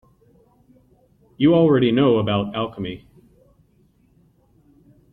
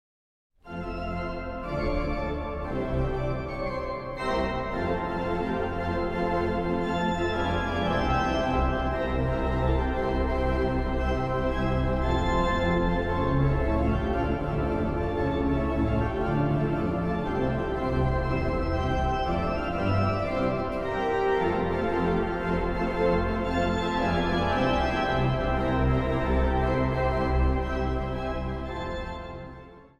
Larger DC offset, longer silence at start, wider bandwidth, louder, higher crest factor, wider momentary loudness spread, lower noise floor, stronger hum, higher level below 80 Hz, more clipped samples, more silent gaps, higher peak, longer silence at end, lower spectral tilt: neither; first, 1.4 s vs 0.65 s; second, 4.2 kHz vs 8.8 kHz; first, -19 LUFS vs -27 LUFS; about the same, 18 dB vs 14 dB; first, 16 LU vs 7 LU; first, -59 dBFS vs -46 dBFS; neither; second, -54 dBFS vs -34 dBFS; neither; neither; first, -4 dBFS vs -12 dBFS; first, 2.15 s vs 0.15 s; first, -10 dB/octave vs -7.5 dB/octave